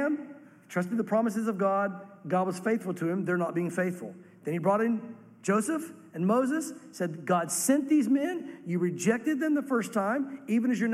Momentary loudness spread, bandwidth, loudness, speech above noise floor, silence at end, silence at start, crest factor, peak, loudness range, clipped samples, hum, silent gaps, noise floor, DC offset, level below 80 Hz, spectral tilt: 10 LU; 15 kHz; -29 LUFS; 20 dB; 0 s; 0 s; 16 dB; -12 dBFS; 2 LU; under 0.1%; none; none; -48 dBFS; under 0.1%; -80 dBFS; -6 dB/octave